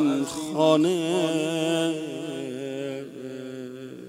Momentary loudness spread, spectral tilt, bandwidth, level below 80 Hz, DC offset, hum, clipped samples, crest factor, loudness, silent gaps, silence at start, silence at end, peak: 16 LU; -5 dB/octave; 16 kHz; -70 dBFS; under 0.1%; none; under 0.1%; 20 dB; -25 LUFS; none; 0 s; 0 s; -6 dBFS